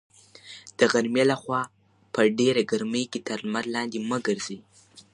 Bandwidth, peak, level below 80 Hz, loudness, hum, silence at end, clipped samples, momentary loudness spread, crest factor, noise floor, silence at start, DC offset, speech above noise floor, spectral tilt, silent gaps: 11 kHz; -4 dBFS; -72 dBFS; -25 LUFS; none; 0.15 s; under 0.1%; 15 LU; 22 dB; -48 dBFS; 0.45 s; under 0.1%; 23 dB; -4.5 dB/octave; none